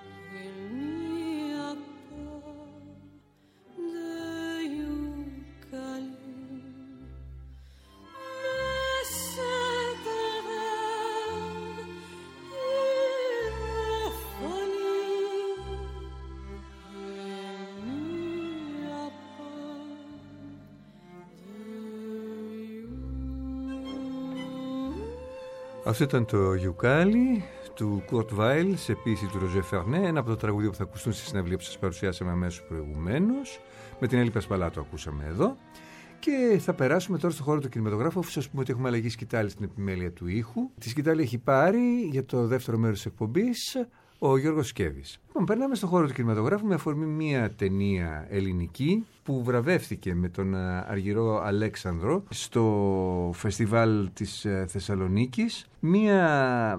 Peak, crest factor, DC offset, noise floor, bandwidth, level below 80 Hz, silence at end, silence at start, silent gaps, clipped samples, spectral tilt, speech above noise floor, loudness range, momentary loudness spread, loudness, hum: -10 dBFS; 20 dB; under 0.1%; -61 dBFS; 16 kHz; -50 dBFS; 0 s; 0 s; none; under 0.1%; -6.5 dB/octave; 34 dB; 12 LU; 18 LU; -29 LUFS; none